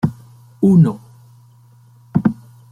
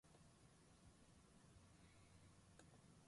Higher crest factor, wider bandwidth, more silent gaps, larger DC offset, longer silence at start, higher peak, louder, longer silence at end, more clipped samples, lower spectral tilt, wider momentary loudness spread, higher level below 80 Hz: about the same, 16 dB vs 20 dB; second, 10 kHz vs 11.5 kHz; neither; neither; about the same, 0.05 s vs 0.05 s; first, -2 dBFS vs -50 dBFS; first, -16 LUFS vs -69 LUFS; first, 0.4 s vs 0 s; neither; first, -10.5 dB/octave vs -4.5 dB/octave; first, 19 LU vs 1 LU; first, -54 dBFS vs -78 dBFS